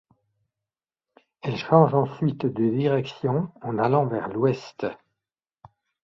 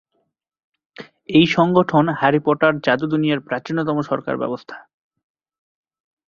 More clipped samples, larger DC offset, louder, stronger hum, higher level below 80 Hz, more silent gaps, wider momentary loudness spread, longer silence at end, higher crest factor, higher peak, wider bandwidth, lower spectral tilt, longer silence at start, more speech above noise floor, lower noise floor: neither; neither; second, -24 LUFS vs -18 LUFS; neither; about the same, -64 dBFS vs -60 dBFS; neither; first, 13 LU vs 10 LU; second, 1.1 s vs 1.5 s; first, 24 dB vs 18 dB; about the same, -2 dBFS vs -2 dBFS; about the same, 7.2 kHz vs 7.2 kHz; first, -9 dB/octave vs -7 dB/octave; first, 1.45 s vs 1 s; first, 67 dB vs 53 dB; first, -90 dBFS vs -71 dBFS